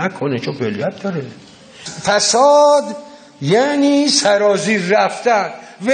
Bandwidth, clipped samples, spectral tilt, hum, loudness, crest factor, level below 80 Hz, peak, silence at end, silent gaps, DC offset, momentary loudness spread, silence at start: 9.6 kHz; under 0.1%; -3.5 dB/octave; none; -15 LUFS; 16 dB; -64 dBFS; 0 dBFS; 0 s; none; under 0.1%; 16 LU; 0 s